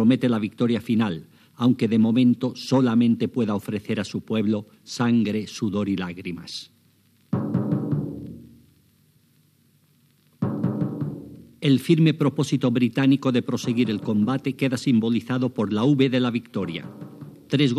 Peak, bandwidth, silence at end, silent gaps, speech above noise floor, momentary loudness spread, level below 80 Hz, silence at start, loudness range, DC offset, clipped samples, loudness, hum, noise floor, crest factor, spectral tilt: -6 dBFS; 13.5 kHz; 0 s; none; 39 dB; 14 LU; -64 dBFS; 0 s; 9 LU; under 0.1%; under 0.1%; -23 LUFS; none; -61 dBFS; 16 dB; -7 dB/octave